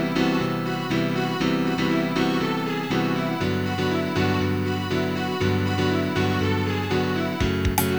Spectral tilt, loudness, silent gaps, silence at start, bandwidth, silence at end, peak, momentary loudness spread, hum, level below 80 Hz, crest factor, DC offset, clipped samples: -6 dB/octave; -24 LUFS; none; 0 s; over 20 kHz; 0 s; -6 dBFS; 2 LU; none; -42 dBFS; 18 dB; 0.3%; under 0.1%